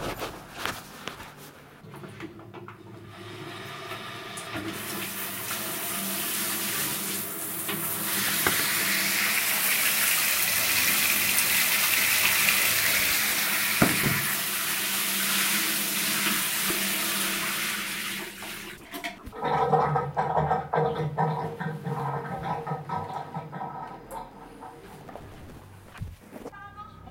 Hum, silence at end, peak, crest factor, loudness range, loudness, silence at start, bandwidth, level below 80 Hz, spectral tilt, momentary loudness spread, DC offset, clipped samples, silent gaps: none; 0 s; -4 dBFS; 24 dB; 19 LU; -24 LUFS; 0 s; 16 kHz; -56 dBFS; -2 dB/octave; 22 LU; under 0.1%; under 0.1%; none